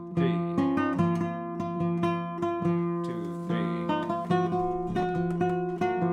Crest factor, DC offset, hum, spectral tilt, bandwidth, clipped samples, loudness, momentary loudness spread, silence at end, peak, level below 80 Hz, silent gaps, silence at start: 14 dB; under 0.1%; none; -8.5 dB/octave; 7 kHz; under 0.1%; -29 LUFS; 5 LU; 0 s; -14 dBFS; -56 dBFS; none; 0 s